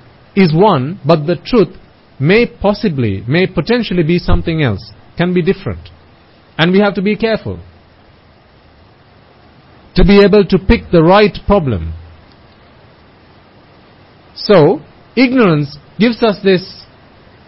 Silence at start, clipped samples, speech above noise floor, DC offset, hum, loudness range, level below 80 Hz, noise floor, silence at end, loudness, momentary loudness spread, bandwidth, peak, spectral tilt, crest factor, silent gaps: 0.35 s; under 0.1%; 34 dB; under 0.1%; none; 6 LU; -28 dBFS; -45 dBFS; 0.65 s; -12 LUFS; 13 LU; 5.8 kHz; 0 dBFS; -9.5 dB/octave; 14 dB; none